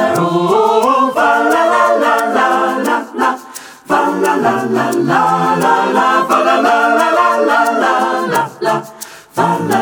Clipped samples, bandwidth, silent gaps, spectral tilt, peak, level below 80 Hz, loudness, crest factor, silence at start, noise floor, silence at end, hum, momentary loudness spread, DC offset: under 0.1%; over 20 kHz; none; -4.5 dB/octave; 0 dBFS; -60 dBFS; -12 LUFS; 12 dB; 0 s; -33 dBFS; 0 s; none; 6 LU; under 0.1%